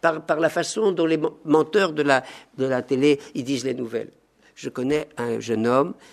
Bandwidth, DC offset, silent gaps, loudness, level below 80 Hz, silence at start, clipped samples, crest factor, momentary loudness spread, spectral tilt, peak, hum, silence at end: 13.5 kHz; under 0.1%; none; -23 LUFS; -64 dBFS; 0.05 s; under 0.1%; 20 dB; 9 LU; -5 dB/octave; -2 dBFS; none; 0.2 s